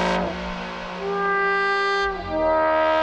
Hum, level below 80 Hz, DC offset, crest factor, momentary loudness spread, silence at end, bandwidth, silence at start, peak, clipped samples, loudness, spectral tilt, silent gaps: none; -44 dBFS; under 0.1%; 14 dB; 10 LU; 0 s; 9.6 kHz; 0 s; -8 dBFS; under 0.1%; -22 LUFS; -5 dB/octave; none